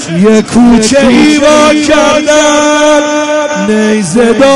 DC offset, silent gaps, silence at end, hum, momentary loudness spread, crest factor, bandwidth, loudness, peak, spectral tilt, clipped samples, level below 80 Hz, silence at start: under 0.1%; none; 0 s; none; 5 LU; 6 dB; 11.5 kHz; -6 LUFS; 0 dBFS; -4 dB/octave; 0.4%; -34 dBFS; 0 s